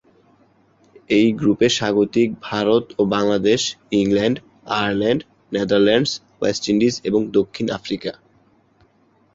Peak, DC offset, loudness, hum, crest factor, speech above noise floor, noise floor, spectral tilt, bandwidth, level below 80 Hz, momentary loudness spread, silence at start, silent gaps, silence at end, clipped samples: -2 dBFS; under 0.1%; -19 LUFS; none; 16 dB; 40 dB; -58 dBFS; -5 dB/octave; 8 kHz; -54 dBFS; 8 LU; 1.1 s; none; 1.25 s; under 0.1%